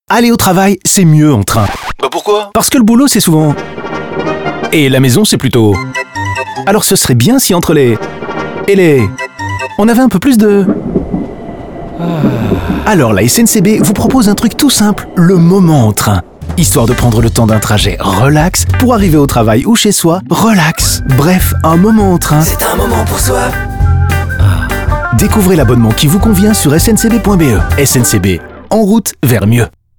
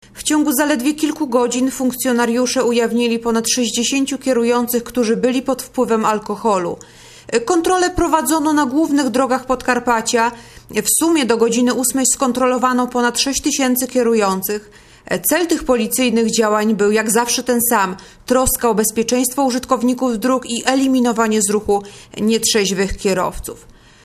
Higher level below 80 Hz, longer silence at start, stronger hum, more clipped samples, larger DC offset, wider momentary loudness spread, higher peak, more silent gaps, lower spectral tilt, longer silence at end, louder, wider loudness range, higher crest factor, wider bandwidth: first, -22 dBFS vs -42 dBFS; about the same, 0.1 s vs 0.15 s; neither; neither; neither; first, 9 LU vs 5 LU; about the same, 0 dBFS vs 0 dBFS; neither; first, -5 dB/octave vs -3 dB/octave; about the same, 0.3 s vs 0.35 s; first, -9 LUFS vs -16 LUFS; about the same, 3 LU vs 2 LU; second, 8 dB vs 16 dB; first, over 20 kHz vs 14 kHz